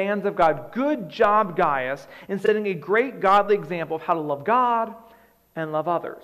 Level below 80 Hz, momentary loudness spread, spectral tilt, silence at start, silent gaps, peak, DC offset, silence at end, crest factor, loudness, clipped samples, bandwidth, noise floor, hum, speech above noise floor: -60 dBFS; 10 LU; -7 dB/octave; 0 s; none; -6 dBFS; under 0.1%; 0 s; 16 dB; -23 LUFS; under 0.1%; 12.5 kHz; -54 dBFS; none; 32 dB